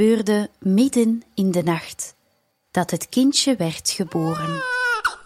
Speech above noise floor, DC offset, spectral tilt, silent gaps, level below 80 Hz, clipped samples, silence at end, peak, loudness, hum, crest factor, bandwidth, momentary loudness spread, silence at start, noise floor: 47 dB; under 0.1%; -4.5 dB/octave; none; -60 dBFS; under 0.1%; 0.05 s; -6 dBFS; -21 LUFS; none; 14 dB; 16 kHz; 8 LU; 0 s; -67 dBFS